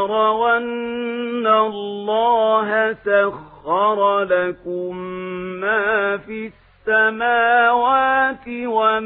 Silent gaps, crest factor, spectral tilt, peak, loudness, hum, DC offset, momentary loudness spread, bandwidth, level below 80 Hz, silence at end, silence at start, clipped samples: none; 16 dB; -9.5 dB/octave; -4 dBFS; -18 LUFS; none; under 0.1%; 12 LU; 4.1 kHz; -56 dBFS; 0 s; 0 s; under 0.1%